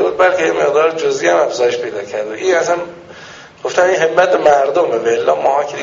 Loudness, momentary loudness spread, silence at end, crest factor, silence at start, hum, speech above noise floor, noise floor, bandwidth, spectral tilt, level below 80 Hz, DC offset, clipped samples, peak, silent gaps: -14 LUFS; 11 LU; 0 s; 14 dB; 0 s; none; 22 dB; -36 dBFS; 7.6 kHz; -2 dB/octave; -56 dBFS; under 0.1%; under 0.1%; 0 dBFS; none